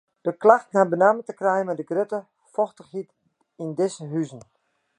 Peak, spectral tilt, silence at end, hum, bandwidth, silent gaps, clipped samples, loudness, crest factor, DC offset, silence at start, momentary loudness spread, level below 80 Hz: -2 dBFS; -6.5 dB/octave; 0.6 s; none; 9.8 kHz; none; under 0.1%; -23 LUFS; 22 dB; under 0.1%; 0.25 s; 18 LU; -78 dBFS